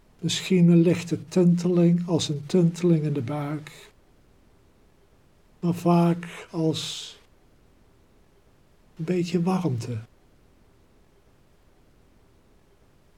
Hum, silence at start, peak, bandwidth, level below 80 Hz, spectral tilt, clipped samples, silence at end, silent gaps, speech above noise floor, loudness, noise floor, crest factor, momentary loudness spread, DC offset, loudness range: none; 0.2 s; -8 dBFS; 11.5 kHz; -62 dBFS; -6.5 dB/octave; under 0.1%; 3.15 s; none; 37 dB; -24 LUFS; -59 dBFS; 18 dB; 15 LU; under 0.1%; 10 LU